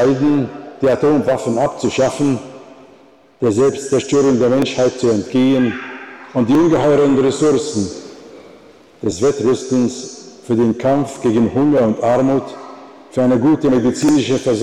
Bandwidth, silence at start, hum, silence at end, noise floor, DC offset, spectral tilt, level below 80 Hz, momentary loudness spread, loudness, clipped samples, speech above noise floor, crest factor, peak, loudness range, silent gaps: 12 kHz; 0 s; none; 0 s; -47 dBFS; 0.1%; -6 dB/octave; -50 dBFS; 12 LU; -15 LUFS; under 0.1%; 32 dB; 10 dB; -6 dBFS; 3 LU; none